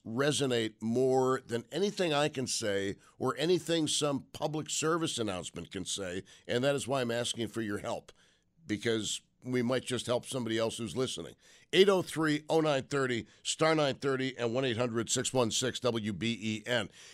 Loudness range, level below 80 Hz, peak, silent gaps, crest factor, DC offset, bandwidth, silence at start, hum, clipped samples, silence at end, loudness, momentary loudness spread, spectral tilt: 5 LU; -68 dBFS; -10 dBFS; none; 22 dB; under 0.1%; 15 kHz; 0.05 s; none; under 0.1%; 0 s; -32 LUFS; 8 LU; -4 dB/octave